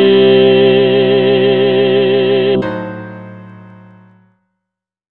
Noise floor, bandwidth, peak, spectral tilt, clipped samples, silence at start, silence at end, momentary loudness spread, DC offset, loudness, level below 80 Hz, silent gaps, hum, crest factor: -80 dBFS; 4.4 kHz; 0 dBFS; -9 dB/octave; under 0.1%; 0 s; 1.5 s; 17 LU; under 0.1%; -10 LUFS; -58 dBFS; none; none; 12 dB